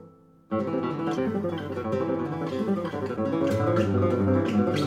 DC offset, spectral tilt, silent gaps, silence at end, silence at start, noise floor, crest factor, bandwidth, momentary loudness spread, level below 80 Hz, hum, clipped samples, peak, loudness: under 0.1%; -8 dB/octave; none; 0 s; 0 s; -52 dBFS; 14 dB; 13.5 kHz; 7 LU; -66 dBFS; none; under 0.1%; -12 dBFS; -27 LUFS